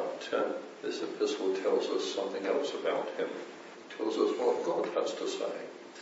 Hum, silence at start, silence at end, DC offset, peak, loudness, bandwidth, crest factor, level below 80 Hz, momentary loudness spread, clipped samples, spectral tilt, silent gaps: none; 0 s; 0 s; under 0.1%; -16 dBFS; -33 LUFS; 8 kHz; 18 dB; under -90 dBFS; 10 LU; under 0.1%; -3.5 dB/octave; none